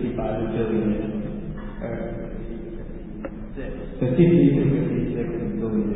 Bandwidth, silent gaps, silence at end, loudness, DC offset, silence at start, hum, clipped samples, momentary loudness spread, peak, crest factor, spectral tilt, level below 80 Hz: 4 kHz; none; 0 s; -23 LUFS; under 0.1%; 0 s; none; under 0.1%; 18 LU; -4 dBFS; 18 dB; -13 dB/octave; -38 dBFS